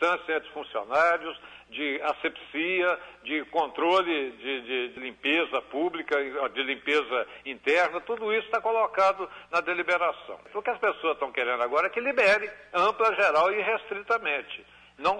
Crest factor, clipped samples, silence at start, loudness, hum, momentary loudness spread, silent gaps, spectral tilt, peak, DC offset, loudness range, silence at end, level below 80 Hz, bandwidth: 14 dB; under 0.1%; 0 s; -27 LUFS; none; 10 LU; none; -3.5 dB/octave; -12 dBFS; under 0.1%; 3 LU; 0 s; -68 dBFS; 10.5 kHz